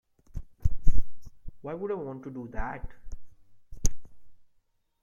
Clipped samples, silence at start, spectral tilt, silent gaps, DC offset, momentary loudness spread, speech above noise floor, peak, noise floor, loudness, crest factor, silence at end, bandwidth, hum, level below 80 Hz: under 0.1%; 0.35 s; -5.5 dB/octave; none; under 0.1%; 19 LU; 34 dB; -4 dBFS; -69 dBFS; -37 LUFS; 20 dB; 0.7 s; 7.6 kHz; none; -34 dBFS